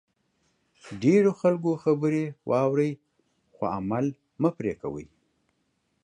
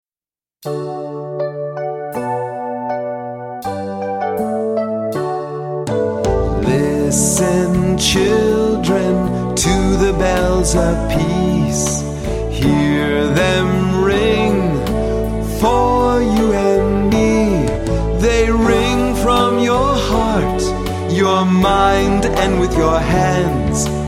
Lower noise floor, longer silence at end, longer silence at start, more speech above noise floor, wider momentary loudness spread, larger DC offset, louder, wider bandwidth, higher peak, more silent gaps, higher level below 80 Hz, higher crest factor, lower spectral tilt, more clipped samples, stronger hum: second, -74 dBFS vs under -90 dBFS; first, 1 s vs 0 s; first, 0.85 s vs 0.65 s; second, 49 dB vs over 76 dB; first, 14 LU vs 10 LU; neither; second, -26 LUFS vs -16 LUFS; second, 10 kHz vs 16 kHz; second, -10 dBFS vs 0 dBFS; neither; second, -62 dBFS vs -26 dBFS; about the same, 18 dB vs 14 dB; first, -8 dB/octave vs -5 dB/octave; neither; neither